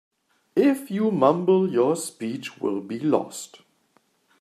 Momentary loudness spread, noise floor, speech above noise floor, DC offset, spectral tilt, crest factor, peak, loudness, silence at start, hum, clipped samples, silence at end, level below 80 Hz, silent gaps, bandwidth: 11 LU; -65 dBFS; 43 dB; under 0.1%; -6 dB/octave; 18 dB; -6 dBFS; -23 LUFS; 0.55 s; none; under 0.1%; 0.85 s; -76 dBFS; none; 14.5 kHz